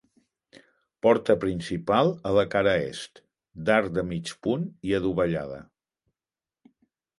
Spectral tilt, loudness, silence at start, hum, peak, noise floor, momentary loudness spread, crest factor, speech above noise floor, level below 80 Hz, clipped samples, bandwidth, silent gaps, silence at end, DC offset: -6 dB/octave; -25 LUFS; 1.05 s; none; -6 dBFS; under -90 dBFS; 11 LU; 20 dB; over 65 dB; -54 dBFS; under 0.1%; 11.5 kHz; none; 1.55 s; under 0.1%